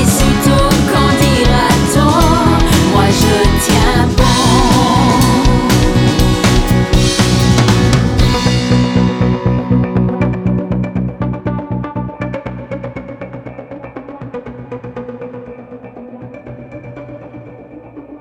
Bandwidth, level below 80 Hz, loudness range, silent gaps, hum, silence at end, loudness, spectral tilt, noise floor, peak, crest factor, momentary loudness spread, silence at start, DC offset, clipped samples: 17.5 kHz; -20 dBFS; 18 LU; none; none; 0 s; -12 LUFS; -5.5 dB/octave; -33 dBFS; 0 dBFS; 12 dB; 20 LU; 0 s; under 0.1%; under 0.1%